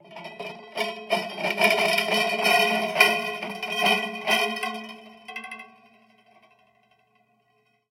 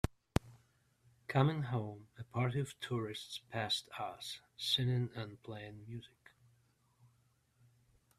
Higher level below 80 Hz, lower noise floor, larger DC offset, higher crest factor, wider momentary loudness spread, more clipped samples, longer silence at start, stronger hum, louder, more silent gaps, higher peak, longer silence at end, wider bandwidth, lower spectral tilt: second, -78 dBFS vs -58 dBFS; second, -68 dBFS vs -74 dBFS; neither; about the same, 26 dB vs 30 dB; first, 19 LU vs 16 LU; neither; about the same, 0.05 s vs 0.05 s; neither; first, -23 LUFS vs -38 LUFS; neither; first, 0 dBFS vs -10 dBFS; first, 2.25 s vs 2.1 s; first, 16.5 kHz vs 14 kHz; second, -2 dB/octave vs -5.5 dB/octave